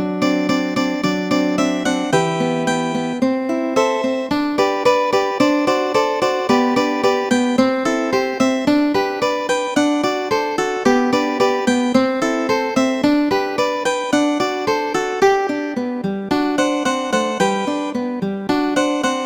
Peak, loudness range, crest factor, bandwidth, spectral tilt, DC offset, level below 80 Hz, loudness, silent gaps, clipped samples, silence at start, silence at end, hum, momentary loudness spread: -2 dBFS; 2 LU; 16 dB; 19 kHz; -4.5 dB/octave; under 0.1%; -54 dBFS; -18 LUFS; none; under 0.1%; 0 s; 0 s; none; 4 LU